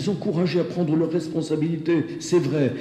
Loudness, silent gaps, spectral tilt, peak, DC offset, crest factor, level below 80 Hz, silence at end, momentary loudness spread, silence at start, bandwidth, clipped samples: -23 LUFS; none; -7 dB/octave; -10 dBFS; under 0.1%; 14 dB; -62 dBFS; 0 s; 3 LU; 0 s; 11.5 kHz; under 0.1%